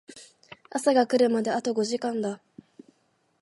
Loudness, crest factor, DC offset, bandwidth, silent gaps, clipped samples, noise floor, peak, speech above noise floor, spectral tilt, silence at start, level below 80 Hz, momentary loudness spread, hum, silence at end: -25 LUFS; 20 dB; under 0.1%; 11.5 kHz; none; under 0.1%; -70 dBFS; -8 dBFS; 45 dB; -4.5 dB/octave; 0.1 s; -80 dBFS; 13 LU; none; 1.05 s